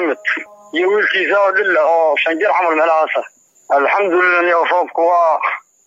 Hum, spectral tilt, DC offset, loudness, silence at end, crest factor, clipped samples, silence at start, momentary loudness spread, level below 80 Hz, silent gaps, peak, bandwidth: none; -3.5 dB/octave; under 0.1%; -14 LUFS; 0.25 s; 10 dB; under 0.1%; 0 s; 6 LU; -76 dBFS; none; -4 dBFS; 7.8 kHz